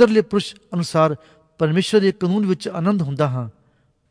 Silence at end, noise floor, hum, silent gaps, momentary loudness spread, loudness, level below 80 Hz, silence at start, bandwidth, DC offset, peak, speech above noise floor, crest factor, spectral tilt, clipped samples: 0.6 s; -61 dBFS; none; none; 10 LU; -20 LUFS; -60 dBFS; 0 s; 11 kHz; under 0.1%; 0 dBFS; 42 dB; 18 dB; -6.5 dB/octave; under 0.1%